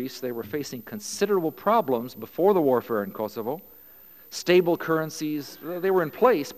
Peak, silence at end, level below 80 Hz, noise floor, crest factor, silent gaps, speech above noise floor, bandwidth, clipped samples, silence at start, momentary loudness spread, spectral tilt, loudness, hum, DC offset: -6 dBFS; 0 s; -68 dBFS; -50 dBFS; 18 dB; none; 25 dB; 15.5 kHz; under 0.1%; 0 s; 13 LU; -5 dB/octave; -25 LUFS; none; 0.1%